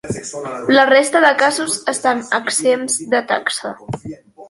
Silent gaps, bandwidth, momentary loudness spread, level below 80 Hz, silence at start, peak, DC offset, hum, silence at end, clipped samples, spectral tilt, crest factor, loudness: none; 11.5 kHz; 16 LU; -54 dBFS; 0.05 s; 0 dBFS; under 0.1%; none; 0.05 s; under 0.1%; -2.5 dB/octave; 16 dB; -15 LUFS